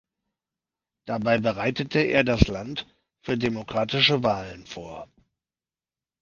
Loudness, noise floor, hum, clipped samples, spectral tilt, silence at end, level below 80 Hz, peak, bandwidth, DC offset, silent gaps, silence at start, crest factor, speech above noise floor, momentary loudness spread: -24 LUFS; under -90 dBFS; none; under 0.1%; -6 dB/octave; 1.15 s; -42 dBFS; 0 dBFS; 7.4 kHz; under 0.1%; none; 1.05 s; 26 dB; over 66 dB; 19 LU